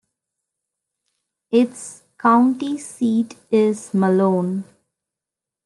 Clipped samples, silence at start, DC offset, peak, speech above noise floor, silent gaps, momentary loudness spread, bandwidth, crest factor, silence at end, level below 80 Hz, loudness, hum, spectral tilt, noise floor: under 0.1%; 1.5 s; under 0.1%; -4 dBFS; 69 dB; none; 11 LU; 11.5 kHz; 18 dB; 1 s; -72 dBFS; -19 LUFS; none; -7 dB/octave; -87 dBFS